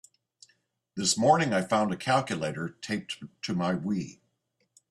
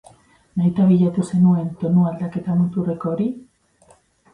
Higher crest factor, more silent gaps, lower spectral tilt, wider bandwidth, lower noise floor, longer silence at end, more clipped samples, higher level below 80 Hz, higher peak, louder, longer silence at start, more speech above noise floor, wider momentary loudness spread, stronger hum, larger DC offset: first, 20 dB vs 14 dB; neither; second, -4 dB/octave vs -9.5 dB/octave; first, 13 kHz vs 10 kHz; first, -76 dBFS vs -55 dBFS; about the same, 0.8 s vs 0.9 s; neither; second, -68 dBFS vs -56 dBFS; about the same, -8 dBFS vs -6 dBFS; second, -28 LUFS vs -19 LUFS; first, 0.95 s vs 0.55 s; first, 48 dB vs 37 dB; first, 14 LU vs 10 LU; neither; neither